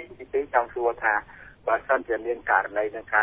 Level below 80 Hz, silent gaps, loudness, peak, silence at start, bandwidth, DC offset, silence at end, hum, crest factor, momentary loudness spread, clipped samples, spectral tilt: -58 dBFS; none; -26 LUFS; -6 dBFS; 0 s; 3.8 kHz; under 0.1%; 0 s; none; 20 dB; 6 LU; under 0.1%; -8 dB/octave